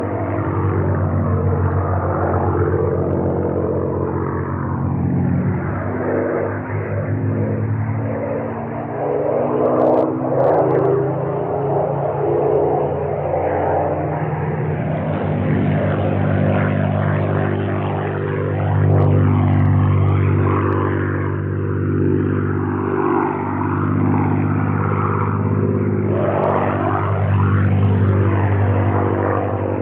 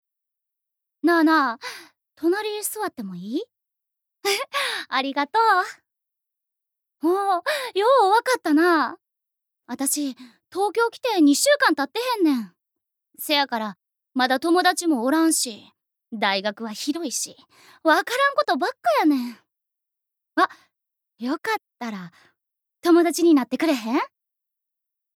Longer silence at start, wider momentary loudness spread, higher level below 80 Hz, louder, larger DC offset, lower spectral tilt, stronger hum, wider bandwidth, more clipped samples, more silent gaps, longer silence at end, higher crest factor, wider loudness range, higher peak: second, 0 s vs 1.05 s; second, 6 LU vs 15 LU; first, -44 dBFS vs -84 dBFS; first, -18 LUFS vs -22 LUFS; neither; first, -12 dB/octave vs -2.5 dB/octave; neither; second, 3.6 kHz vs 18 kHz; neither; neither; second, 0 s vs 1.1 s; second, 12 dB vs 20 dB; about the same, 4 LU vs 5 LU; about the same, -6 dBFS vs -4 dBFS